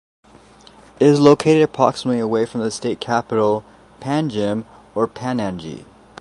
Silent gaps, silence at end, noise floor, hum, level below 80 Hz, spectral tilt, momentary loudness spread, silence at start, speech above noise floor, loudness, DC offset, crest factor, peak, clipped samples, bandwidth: none; 0.35 s; -46 dBFS; none; -54 dBFS; -6 dB/octave; 15 LU; 1 s; 29 dB; -18 LUFS; under 0.1%; 20 dB; 0 dBFS; under 0.1%; 11.5 kHz